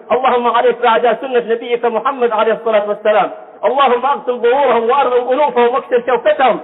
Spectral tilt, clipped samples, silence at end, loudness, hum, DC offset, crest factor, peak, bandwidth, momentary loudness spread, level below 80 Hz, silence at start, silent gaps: -8 dB/octave; under 0.1%; 0 s; -14 LUFS; none; under 0.1%; 10 dB; -2 dBFS; 4.1 kHz; 4 LU; -62 dBFS; 0.05 s; none